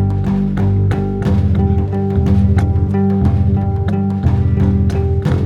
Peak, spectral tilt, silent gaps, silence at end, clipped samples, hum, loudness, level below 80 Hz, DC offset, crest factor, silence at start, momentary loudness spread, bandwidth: -2 dBFS; -10 dB/octave; none; 0 s; under 0.1%; none; -15 LUFS; -24 dBFS; under 0.1%; 12 dB; 0 s; 3 LU; 6.4 kHz